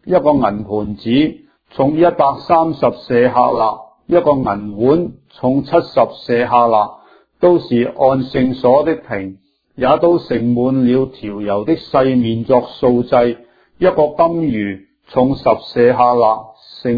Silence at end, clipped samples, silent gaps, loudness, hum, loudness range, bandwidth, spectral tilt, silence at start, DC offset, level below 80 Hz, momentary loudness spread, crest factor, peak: 0 s; under 0.1%; none; -15 LUFS; none; 1 LU; 5 kHz; -9.5 dB/octave; 0.05 s; under 0.1%; -46 dBFS; 9 LU; 14 dB; 0 dBFS